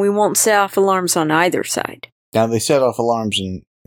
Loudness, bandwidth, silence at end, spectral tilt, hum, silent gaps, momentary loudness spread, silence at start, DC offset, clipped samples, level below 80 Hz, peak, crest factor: -16 LUFS; 18.5 kHz; 0.25 s; -3.5 dB/octave; none; 2.12-2.32 s; 8 LU; 0 s; under 0.1%; under 0.1%; -58 dBFS; -2 dBFS; 14 dB